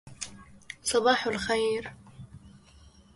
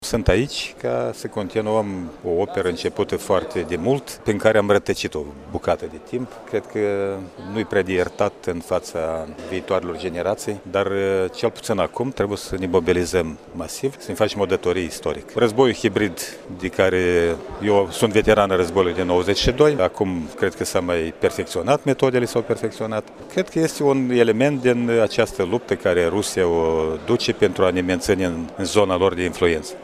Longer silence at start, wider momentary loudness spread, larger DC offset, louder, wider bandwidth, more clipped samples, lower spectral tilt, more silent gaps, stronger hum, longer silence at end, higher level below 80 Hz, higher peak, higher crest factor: about the same, 0.05 s vs 0 s; first, 25 LU vs 10 LU; neither; second, -27 LUFS vs -21 LUFS; second, 11.5 kHz vs 15.5 kHz; neither; second, -2.5 dB/octave vs -5 dB/octave; neither; neither; first, 0.6 s vs 0 s; second, -58 dBFS vs -42 dBFS; second, -8 dBFS vs -2 dBFS; about the same, 22 dB vs 20 dB